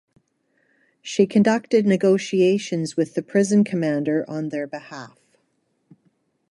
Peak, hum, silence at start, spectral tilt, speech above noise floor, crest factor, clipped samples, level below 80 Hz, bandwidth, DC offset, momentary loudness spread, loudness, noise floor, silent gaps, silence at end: -4 dBFS; none; 1.05 s; -6 dB/octave; 49 dB; 18 dB; under 0.1%; -70 dBFS; 11.5 kHz; under 0.1%; 14 LU; -21 LUFS; -70 dBFS; none; 1.45 s